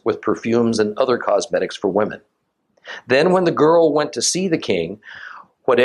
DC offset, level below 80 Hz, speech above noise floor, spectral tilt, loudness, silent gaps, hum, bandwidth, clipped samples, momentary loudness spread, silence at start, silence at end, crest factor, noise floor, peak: under 0.1%; -62 dBFS; 47 dB; -4.5 dB/octave; -18 LUFS; none; none; 12 kHz; under 0.1%; 20 LU; 0.05 s; 0 s; 16 dB; -65 dBFS; -2 dBFS